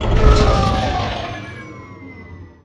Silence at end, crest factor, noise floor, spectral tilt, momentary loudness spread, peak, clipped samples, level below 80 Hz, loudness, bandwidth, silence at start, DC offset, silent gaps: 0.2 s; 18 dB; -37 dBFS; -6 dB/octave; 23 LU; 0 dBFS; under 0.1%; -20 dBFS; -17 LUFS; 9 kHz; 0 s; under 0.1%; none